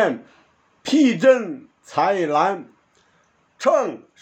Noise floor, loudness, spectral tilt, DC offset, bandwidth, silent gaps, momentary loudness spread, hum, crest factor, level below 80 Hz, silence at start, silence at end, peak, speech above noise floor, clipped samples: -61 dBFS; -19 LUFS; -5 dB/octave; under 0.1%; 8.8 kHz; none; 17 LU; none; 18 dB; -76 dBFS; 0 s; 0.25 s; -4 dBFS; 42 dB; under 0.1%